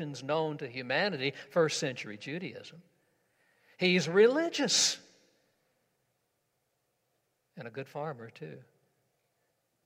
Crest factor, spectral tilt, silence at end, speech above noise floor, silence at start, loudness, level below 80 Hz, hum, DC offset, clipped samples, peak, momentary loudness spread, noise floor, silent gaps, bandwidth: 22 dB; -3 dB/octave; 1.25 s; 48 dB; 0 s; -30 LUFS; -84 dBFS; none; under 0.1%; under 0.1%; -12 dBFS; 20 LU; -79 dBFS; none; 16 kHz